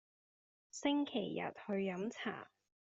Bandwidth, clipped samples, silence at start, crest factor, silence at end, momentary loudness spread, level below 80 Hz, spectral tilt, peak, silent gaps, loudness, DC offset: 7.6 kHz; under 0.1%; 0.75 s; 18 dB; 0.5 s; 15 LU; -84 dBFS; -4 dB/octave; -22 dBFS; none; -40 LUFS; under 0.1%